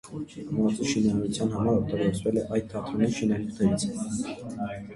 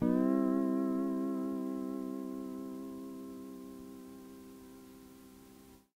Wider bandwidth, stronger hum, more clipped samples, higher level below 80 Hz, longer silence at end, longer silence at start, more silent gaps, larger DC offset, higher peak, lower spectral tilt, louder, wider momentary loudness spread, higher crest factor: second, 11.5 kHz vs 16 kHz; neither; neither; first, -52 dBFS vs -68 dBFS; second, 0 s vs 0.2 s; about the same, 0.05 s vs 0 s; neither; neither; first, -10 dBFS vs -18 dBFS; second, -6 dB/octave vs -8 dB/octave; first, -28 LUFS vs -36 LUFS; second, 9 LU vs 24 LU; about the same, 16 dB vs 18 dB